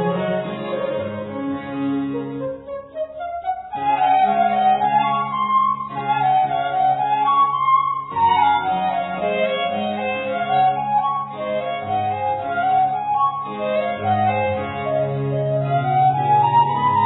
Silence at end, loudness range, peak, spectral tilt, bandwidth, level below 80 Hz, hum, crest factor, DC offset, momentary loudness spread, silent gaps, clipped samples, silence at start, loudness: 0 s; 4 LU; -6 dBFS; -10 dB/octave; 4.1 kHz; -58 dBFS; none; 14 dB; under 0.1%; 10 LU; none; under 0.1%; 0 s; -20 LUFS